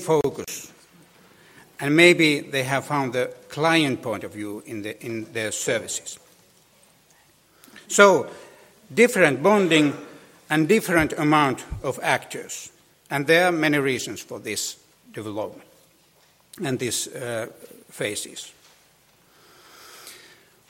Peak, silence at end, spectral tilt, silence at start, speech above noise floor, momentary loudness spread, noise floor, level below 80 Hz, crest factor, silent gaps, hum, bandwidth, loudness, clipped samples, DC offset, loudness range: 0 dBFS; 0.55 s; -4 dB/octave; 0 s; 37 dB; 20 LU; -59 dBFS; -54 dBFS; 24 dB; none; none; 16.5 kHz; -22 LUFS; under 0.1%; under 0.1%; 11 LU